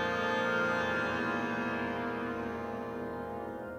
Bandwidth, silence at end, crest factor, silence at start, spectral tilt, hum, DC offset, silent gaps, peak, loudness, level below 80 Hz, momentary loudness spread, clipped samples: 15.5 kHz; 0 s; 14 dB; 0 s; -5.5 dB/octave; none; under 0.1%; none; -20 dBFS; -34 LUFS; -60 dBFS; 9 LU; under 0.1%